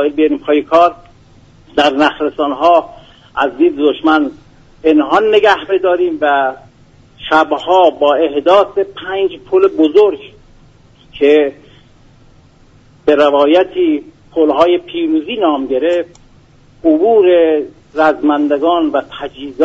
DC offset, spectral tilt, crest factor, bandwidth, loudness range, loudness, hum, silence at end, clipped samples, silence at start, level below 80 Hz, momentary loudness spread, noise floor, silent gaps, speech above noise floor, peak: under 0.1%; -5.5 dB/octave; 12 dB; 7.8 kHz; 2 LU; -12 LUFS; none; 0 s; under 0.1%; 0 s; -48 dBFS; 9 LU; -45 dBFS; none; 33 dB; 0 dBFS